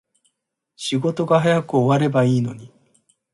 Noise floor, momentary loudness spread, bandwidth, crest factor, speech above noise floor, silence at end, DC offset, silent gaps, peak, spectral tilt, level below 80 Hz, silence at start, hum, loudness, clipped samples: -75 dBFS; 12 LU; 11.5 kHz; 16 dB; 56 dB; 0.65 s; under 0.1%; none; -4 dBFS; -6.5 dB/octave; -60 dBFS; 0.8 s; none; -19 LUFS; under 0.1%